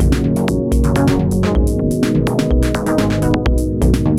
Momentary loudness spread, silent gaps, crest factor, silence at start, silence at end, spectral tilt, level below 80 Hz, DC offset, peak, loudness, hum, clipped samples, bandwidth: 2 LU; none; 12 dB; 0 s; 0 s; -7 dB/octave; -20 dBFS; under 0.1%; -2 dBFS; -16 LUFS; none; under 0.1%; 15 kHz